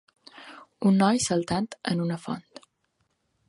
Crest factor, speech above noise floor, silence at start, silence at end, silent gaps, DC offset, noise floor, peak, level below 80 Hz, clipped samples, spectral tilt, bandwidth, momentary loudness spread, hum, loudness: 20 dB; 49 dB; 0.35 s; 1.1 s; none; under 0.1%; -74 dBFS; -8 dBFS; -62 dBFS; under 0.1%; -5 dB/octave; 11.5 kHz; 24 LU; none; -26 LUFS